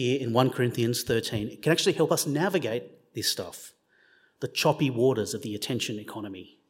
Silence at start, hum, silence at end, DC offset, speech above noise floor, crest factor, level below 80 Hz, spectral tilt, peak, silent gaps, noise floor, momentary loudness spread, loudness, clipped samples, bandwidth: 0 s; none; 0.25 s; under 0.1%; 36 dB; 22 dB; -62 dBFS; -4.5 dB/octave; -6 dBFS; none; -63 dBFS; 14 LU; -27 LUFS; under 0.1%; 16.5 kHz